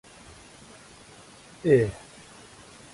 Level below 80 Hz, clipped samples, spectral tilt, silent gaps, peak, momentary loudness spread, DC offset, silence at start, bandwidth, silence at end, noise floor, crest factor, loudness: -56 dBFS; under 0.1%; -7 dB/octave; none; -8 dBFS; 26 LU; under 0.1%; 1.65 s; 11.5 kHz; 0.95 s; -50 dBFS; 22 dB; -24 LUFS